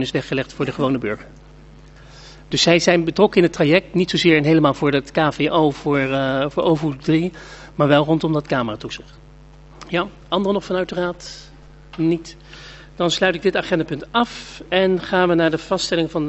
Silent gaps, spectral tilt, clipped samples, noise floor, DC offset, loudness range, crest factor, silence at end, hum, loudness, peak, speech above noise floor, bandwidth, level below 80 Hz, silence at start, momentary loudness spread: none; -5.5 dB/octave; under 0.1%; -43 dBFS; under 0.1%; 8 LU; 20 dB; 0 s; none; -19 LUFS; 0 dBFS; 25 dB; 8.2 kHz; -46 dBFS; 0 s; 16 LU